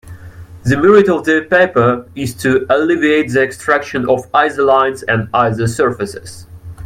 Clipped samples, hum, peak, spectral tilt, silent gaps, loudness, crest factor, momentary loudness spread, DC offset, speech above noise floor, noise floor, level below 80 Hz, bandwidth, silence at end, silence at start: under 0.1%; none; 0 dBFS; -6 dB/octave; none; -13 LUFS; 14 dB; 13 LU; under 0.1%; 21 dB; -34 dBFS; -46 dBFS; 15.5 kHz; 0 s; 0.05 s